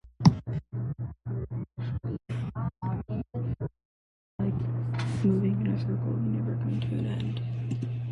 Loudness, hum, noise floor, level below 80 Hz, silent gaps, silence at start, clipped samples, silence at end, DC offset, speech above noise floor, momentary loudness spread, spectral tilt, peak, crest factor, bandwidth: -31 LUFS; none; under -90 dBFS; -50 dBFS; 3.85-4.39 s; 0.05 s; under 0.1%; 0 s; under 0.1%; over 61 dB; 10 LU; -8.5 dB/octave; -6 dBFS; 24 dB; 7.8 kHz